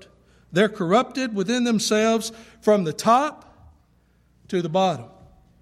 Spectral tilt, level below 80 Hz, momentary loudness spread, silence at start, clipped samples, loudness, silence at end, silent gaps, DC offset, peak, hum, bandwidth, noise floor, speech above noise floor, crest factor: -4.5 dB/octave; -60 dBFS; 8 LU; 0.5 s; under 0.1%; -22 LUFS; 0.55 s; none; under 0.1%; -4 dBFS; 60 Hz at -55 dBFS; 14.5 kHz; -60 dBFS; 39 dB; 18 dB